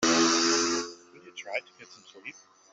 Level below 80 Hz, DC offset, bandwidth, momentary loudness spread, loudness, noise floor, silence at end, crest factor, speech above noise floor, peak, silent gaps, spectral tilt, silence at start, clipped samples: -70 dBFS; under 0.1%; 8.2 kHz; 22 LU; -26 LUFS; -49 dBFS; 0.4 s; 18 dB; 4 dB; -12 dBFS; none; -1.5 dB/octave; 0 s; under 0.1%